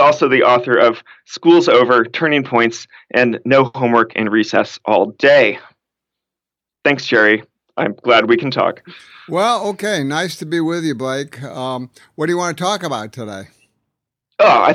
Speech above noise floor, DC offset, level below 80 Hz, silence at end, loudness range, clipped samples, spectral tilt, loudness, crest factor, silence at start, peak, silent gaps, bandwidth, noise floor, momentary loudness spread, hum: 71 dB; under 0.1%; -66 dBFS; 0 s; 7 LU; under 0.1%; -5 dB/octave; -15 LUFS; 16 dB; 0 s; 0 dBFS; none; 14 kHz; -86 dBFS; 17 LU; none